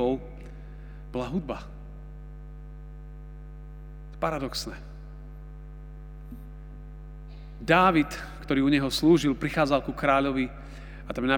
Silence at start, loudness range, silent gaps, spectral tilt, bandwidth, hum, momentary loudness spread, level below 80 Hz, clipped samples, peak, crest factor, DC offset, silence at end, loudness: 0 s; 15 LU; none; -5.5 dB/octave; 16.5 kHz; none; 23 LU; -42 dBFS; under 0.1%; -4 dBFS; 24 dB; under 0.1%; 0 s; -26 LUFS